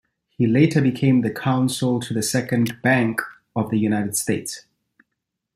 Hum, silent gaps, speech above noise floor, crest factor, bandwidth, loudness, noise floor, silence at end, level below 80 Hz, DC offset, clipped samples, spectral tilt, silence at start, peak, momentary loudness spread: none; none; 60 dB; 18 dB; 15.5 kHz; -21 LUFS; -80 dBFS; 0.95 s; -60 dBFS; under 0.1%; under 0.1%; -5.5 dB/octave; 0.4 s; -4 dBFS; 9 LU